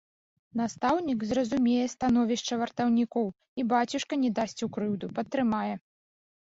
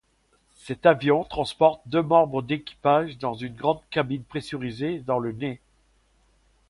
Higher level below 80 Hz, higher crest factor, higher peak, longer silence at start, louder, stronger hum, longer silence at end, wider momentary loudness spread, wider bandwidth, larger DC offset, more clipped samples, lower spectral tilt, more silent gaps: second, -62 dBFS vs -56 dBFS; second, 16 dB vs 22 dB; second, -14 dBFS vs -4 dBFS; about the same, 0.55 s vs 0.65 s; second, -29 LUFS vs -24 LUFS; neither; second, 0.7 s vs 1.15 s; second, 7 LU vs 12 LU; second, 7.8 kHz vs 11.5 kHz; neither; neither; second, -5 dB/octave vs -7 dB/octave; first, 3.48-3.56 s vs none